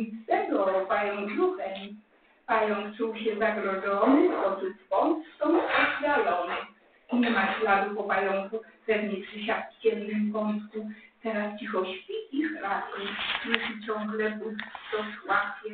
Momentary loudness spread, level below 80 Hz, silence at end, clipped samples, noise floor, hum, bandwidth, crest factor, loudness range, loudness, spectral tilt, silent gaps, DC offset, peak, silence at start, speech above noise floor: 11 LU; -68 dBFS; 0 s; under 0.1%; -60 dBFS; none; 4.6 kHz; 24 dB; 5 LU; -28 LUFS; -2.5 dB/octave; none; under 0.1%; -4 dBFS; 0 s; 32 dB